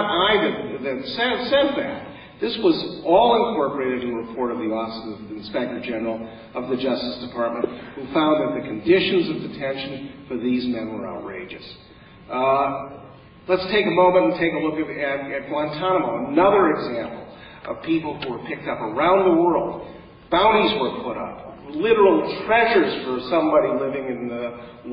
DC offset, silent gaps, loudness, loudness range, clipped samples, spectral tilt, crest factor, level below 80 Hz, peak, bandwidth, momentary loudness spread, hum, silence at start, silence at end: under 0.1%; none; -21 LUFS; 7 LU; under 0.1%; -10 dB/octave; 18 dB; -52 dBFS; -4 dBFS; 5.4 kHz; 17 LU; none; 0 s; 0 s